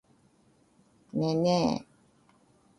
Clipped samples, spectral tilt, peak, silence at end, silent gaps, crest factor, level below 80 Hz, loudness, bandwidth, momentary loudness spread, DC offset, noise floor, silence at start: under 0.1%; -6.5 dB/octave; -14 dBFS; 0.95 s; none; 18 dB; -64 dBFS; -29 LUFS; 11.5 kHz; 11 LU; under 0.1%; -65 dBFS; 1.15 s